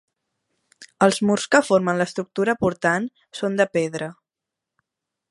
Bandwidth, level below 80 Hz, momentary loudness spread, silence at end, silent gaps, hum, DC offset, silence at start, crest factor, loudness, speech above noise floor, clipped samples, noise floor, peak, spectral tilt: 11.5 kHz; -60 dBFS; 11 LU; 1.2 s; none; none; under 0.1%; 0.8 s; 22 dB; -21 LUFS; 65 dB; under 0.1%; -86 dBFS; -2 dBFS; -5 dB/octave